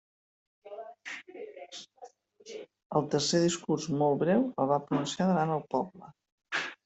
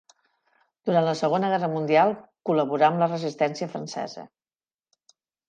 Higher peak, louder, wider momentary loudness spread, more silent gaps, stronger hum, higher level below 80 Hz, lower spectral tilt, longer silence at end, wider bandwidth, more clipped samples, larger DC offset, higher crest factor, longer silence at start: second, -14 dBFS vs -6 dBFS; second, -29 LUFS vs -24 LUFS; first, 19 LU vs 13 LU; first, 2.86-2.90 s, 6.32-6.38 s vs none; neither; first, -72 dBFS vs -78 dBFS; about the same, -5 dB/octave vs -6 dB/octave; second, 0.1 s vs 1.25 s; second, 8.2 kHz vs 9.2 kHz; neither; neither; about the same, 18 dB vs 18 dB; second, 0.65 s vs 0.85 s